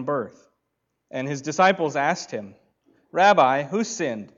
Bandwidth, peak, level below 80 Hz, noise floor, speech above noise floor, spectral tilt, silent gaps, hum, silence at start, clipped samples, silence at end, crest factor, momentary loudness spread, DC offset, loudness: 7.8 kHz; -6 dBFS; -74 dBFS; -77 dBFS; 55 dB; -4.5 dB/octave; none; none; 0 s; under 0.1%; 0.1 s; 18 dB; 17 LU; under 0.1%; -22 LUFS